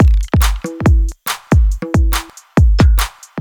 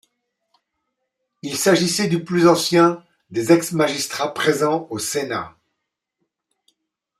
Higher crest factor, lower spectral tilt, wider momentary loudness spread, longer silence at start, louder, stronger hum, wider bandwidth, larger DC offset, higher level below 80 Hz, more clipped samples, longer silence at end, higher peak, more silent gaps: second, 12 dB vs 20 dB; first, -6 dB/octave vs -4.5 dB/octave; second, 8 LU vs 13 LU; second, 0 s vs 1.45 s; first, -15 LUFS vs -19 LUFS; neither; first, 19.5 kHz vs 15.5 kHz; neither; first, -14 dBFS vs -64 dBFS; neither; second, 0 s vs 1.7 s; about the same, 0 dBFS vs -2 dBFS; neither